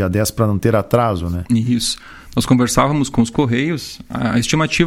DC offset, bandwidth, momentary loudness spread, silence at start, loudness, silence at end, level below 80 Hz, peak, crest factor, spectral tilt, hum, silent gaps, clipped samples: under 0.1%; 16.5 kHz; 8 LU; 0 s; -17 LUFS; 0 s; -38 dBFS; 0 dBFS; 16 dB; -5.5 dB/octave; none; none; under 0.1%